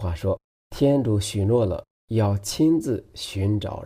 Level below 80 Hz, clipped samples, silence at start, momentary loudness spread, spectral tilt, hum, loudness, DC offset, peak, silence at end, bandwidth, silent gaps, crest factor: -44 dBFS; under 0.1%; 0 s; 10 LU; -6.5 dB/octave; none; -24 LUFS; under 0.1%; -10 dBFS; 0 s; 15.5 kHz; 0.44-0.70 s, 1.90-2.08 s; 14 dB